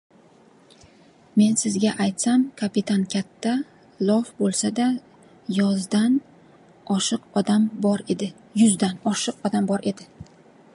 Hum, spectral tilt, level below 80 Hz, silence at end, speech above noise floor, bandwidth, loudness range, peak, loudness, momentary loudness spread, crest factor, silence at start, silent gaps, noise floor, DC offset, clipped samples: none; -5 dB/octave; -66 dBFS; 0.5 s; 32 dB; 11.5 kHz; 2 LU; -6 dBFS; -23 LUFS; 9 LU; 16 dB; 1.35 s; none; -53 dBFS; under 0.1%; under 0.1%